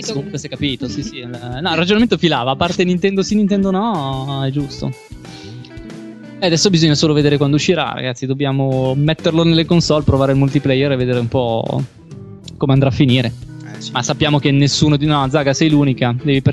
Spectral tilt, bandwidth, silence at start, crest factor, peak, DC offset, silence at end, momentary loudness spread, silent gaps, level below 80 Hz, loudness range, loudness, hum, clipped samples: -5.5 dB/octave; 10.5 kHz; 0 s; 14 dB; 0 dBFS; 0.2%; 0 s; 19 LU; none; -38 dBFS; 3 LU; -15 LUFS; none; under 0.1%